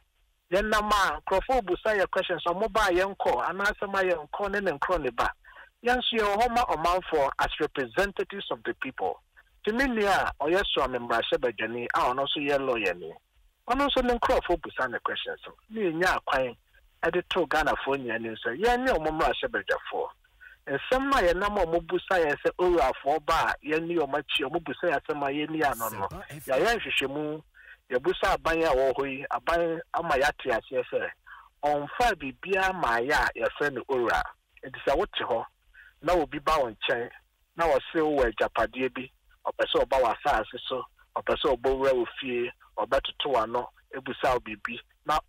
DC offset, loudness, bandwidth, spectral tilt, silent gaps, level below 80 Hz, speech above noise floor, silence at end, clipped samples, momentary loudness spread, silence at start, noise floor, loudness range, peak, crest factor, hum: under 0.1%; -27 LUFS; 16 kHz; -4 dB/octave; none; -48 dBFS; 42 dB; 0.1 s; under 0.1%; 9 LU; 0.5 s; -69 dBFS; 2 LU; -14 dBFS; 14 dB; none